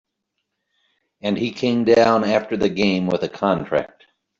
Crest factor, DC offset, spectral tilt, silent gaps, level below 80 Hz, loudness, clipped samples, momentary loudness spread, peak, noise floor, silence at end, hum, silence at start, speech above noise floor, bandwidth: 18 dB; under 0.1%; -6 dB/octave; none; -56 dBFS; -19 LUFS; under 0.1%; 9 LU; -4 dBFS; -77 dBFS; 0.55 s; none; 1.25 s; 58 dB; 7.6 kHz